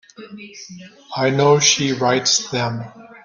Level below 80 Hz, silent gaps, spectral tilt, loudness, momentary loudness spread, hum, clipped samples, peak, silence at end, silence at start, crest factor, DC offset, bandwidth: -60 dBFS; none; -3 dB/octave; -16 LUFS; 23 LU; none; under 0.1%; -2 dBFS; 0.05 s; 0.2 s; 18 dB; under 0.1%; 10.5 kHz